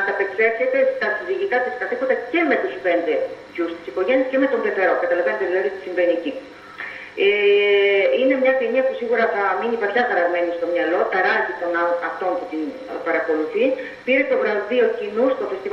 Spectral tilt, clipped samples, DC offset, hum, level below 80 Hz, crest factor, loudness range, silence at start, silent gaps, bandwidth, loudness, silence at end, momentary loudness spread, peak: -5 dB/octave; under 0.1%; under 0.1%; none; -66 dBFS; 16 dB; 3 LU; 0 s; none; 6.4 kHz; -20 LUFS; 0 s; 9 LU; -4 dBFS